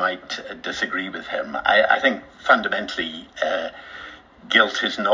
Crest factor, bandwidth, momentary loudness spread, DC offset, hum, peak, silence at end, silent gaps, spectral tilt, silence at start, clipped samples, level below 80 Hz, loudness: 22 dB; 7.6 kHz; 15 LU; under 0.1%; none; -2 dBFS; 0 s; none; -3 dB/octave; 0 s; under 0.1%; -58 dBFS; -21 LUFS